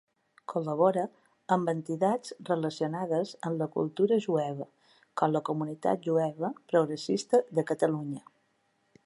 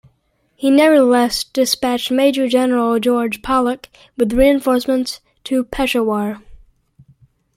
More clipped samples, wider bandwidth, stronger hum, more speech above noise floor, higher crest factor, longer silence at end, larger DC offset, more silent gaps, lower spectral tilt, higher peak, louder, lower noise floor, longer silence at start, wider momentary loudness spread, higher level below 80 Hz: neither; second, 11.5 kHz vs 16.5 kHz; neither; about the same, 44 dB vs 47 dB; about the same, 18 dB vs 16 dB; second, 0.85 s vs 1 s; neither; neither; first, -6.5 dB/octave vs -4 dB/octave; second, -12 dBFS vs 0 dBFS; second, -30 LUFS vs -16 LUFS; first, -73 dBFS vs -63 dBFS; about the same, 0.5 s vs 0.6 s; about the same, 10 LU vs 10 LU; second, -80 dBFS vs -40 dBFS